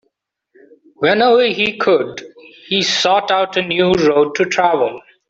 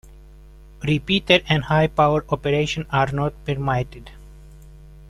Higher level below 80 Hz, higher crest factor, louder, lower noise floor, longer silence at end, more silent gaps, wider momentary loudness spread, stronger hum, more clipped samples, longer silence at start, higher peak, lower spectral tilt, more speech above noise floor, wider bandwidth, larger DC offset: second, -54 dBFS vs -42 dBFS; second, 14 dB vs 20 dB; first, -15 LUFS vs -20 LUFS; first, -69 dBFS vs -44 dBFS; first, 0.3 s vs 0 s; neither; about the same, 7 LU vs 9 LU; neither; neither; first, 1 s vs 0.05 s; about the same, -2 dBFS vs -2 dBFS; second, -4 dB/octave vs -6 dB/octave; first, 55 dB vs 24 dB; second, 7.8 kHz vs 12 kHz; neither